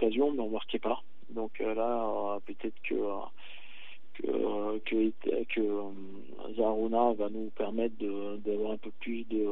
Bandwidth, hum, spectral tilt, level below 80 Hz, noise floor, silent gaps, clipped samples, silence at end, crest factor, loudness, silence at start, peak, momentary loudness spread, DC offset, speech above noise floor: 4.1 kHz; none; -8.5 dB/octave; -84 dBFS; -54 dBFS; none; under 0.1%; 0 s; 18 dB; -33 LUFS; 0 s; -16 dBFS; 16 LU; 2%; 21 dB